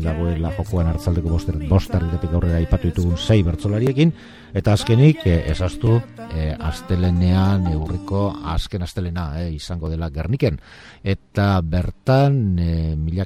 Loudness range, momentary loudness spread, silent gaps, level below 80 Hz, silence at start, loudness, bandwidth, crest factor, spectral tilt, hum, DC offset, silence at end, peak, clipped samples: 5 LU; 9 LU; none; -30 dBFS; 0 s; -20 LUFS; 13 kHz; 18 dB; -7.5 dB/octave; none; 0.1%; 0 s; -2 dBFS; under 0.1%